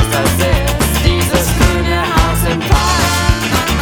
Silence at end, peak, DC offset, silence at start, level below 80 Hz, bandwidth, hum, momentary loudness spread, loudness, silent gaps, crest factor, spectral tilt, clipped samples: 0 s; 0 dBFS; under 0.1%; 0 s; -18 dBFS; over 20 kHz; none; 2 LU; -13 LUFS; none; 12 dB; -4.5 dB/octave; under 0.1%